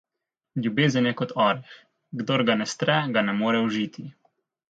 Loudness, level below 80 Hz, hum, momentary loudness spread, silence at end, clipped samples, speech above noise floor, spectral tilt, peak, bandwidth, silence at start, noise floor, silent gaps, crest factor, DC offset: -24 LUFS; -70 dBFS; none; 12 LU; 0.6 s; under 0.1%; 62 dB; -5.5 dB/octave; -6 dBFS; 9 kHz; 0.55 s; -86 dBFS; none; 20 dB; under 0.1%